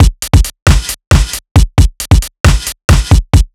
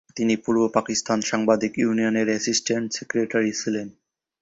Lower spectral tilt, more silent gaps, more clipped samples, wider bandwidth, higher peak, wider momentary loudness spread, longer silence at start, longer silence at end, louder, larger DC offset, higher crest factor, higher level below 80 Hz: first, -5 dB/octave vs -3.5 dB/octave; first, 0.62-0.66 s, 1.07-1.11 s, 1.51-1.55 s, 2.40-2.44 s, 2.84-2.88 s vs none; first, 6% vs under 0.1%; first, 16.5 kHz vs 8 kHz; first, 0 dBFS vs -4 dBFS; about the same, 3 LU vs 5 LU; second, 0 s vs 0.15 s; second, 0.1 s vs 0.5 s; first, -11 LUFS vs -23 LUFS; neither; second, 8 dB vs 20 dB; first, -12 dBFS vs -62 dBFS